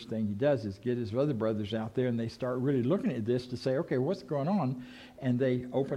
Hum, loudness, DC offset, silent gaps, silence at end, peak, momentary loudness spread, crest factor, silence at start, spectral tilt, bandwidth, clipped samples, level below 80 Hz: none; -31 LUFS; under 0.1%; none; 0 s; -16 dBFS; 5 LU; 14 dB; 0 s; -8.5 dB/octave; 11 kHz; under 0.1%; -66 dBFS